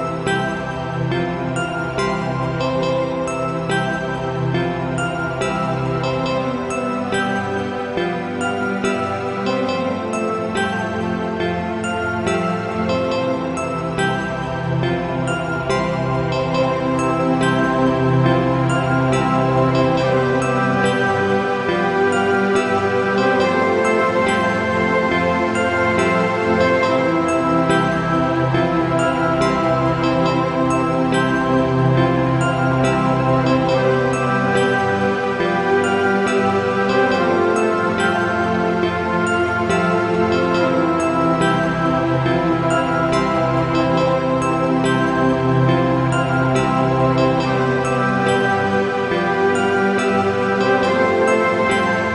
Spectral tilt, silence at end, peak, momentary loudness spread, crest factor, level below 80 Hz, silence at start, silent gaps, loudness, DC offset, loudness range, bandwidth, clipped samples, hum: -6.5 dB/octave; 0 s; -4 dBFS; 5 LU; 14 dB; -42 dBFS; 0 s; none; -18 LUFS; under 0.1%; 4 LU; 11 kHz; under 0.1%; none